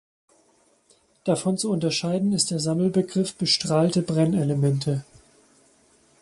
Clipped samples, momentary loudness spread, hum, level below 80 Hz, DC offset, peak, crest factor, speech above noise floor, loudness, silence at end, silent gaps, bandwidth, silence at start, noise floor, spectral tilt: under 0.1%; 5 LU; none; -62 dBFS; under 0.1%; -8 dBFS; 18 dB; 39 dB; -23 LUFS; 1.2 s; none; 11.5 kHz; 1.25 s; -62 dBFS; -5.5 dB/octave